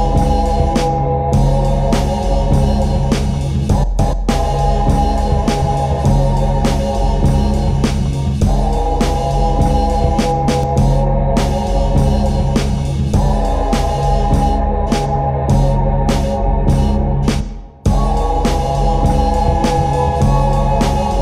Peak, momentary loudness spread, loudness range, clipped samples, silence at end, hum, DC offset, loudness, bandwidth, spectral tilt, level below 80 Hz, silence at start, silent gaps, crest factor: 0 dBFS; 3 LU; 1 LU; under 0.1%; 0 s; none; under 0.1%; -16 LUFS; 12.5 kHz; -7 dB/octave; -16 dBFS; 0 s; none; 14 dB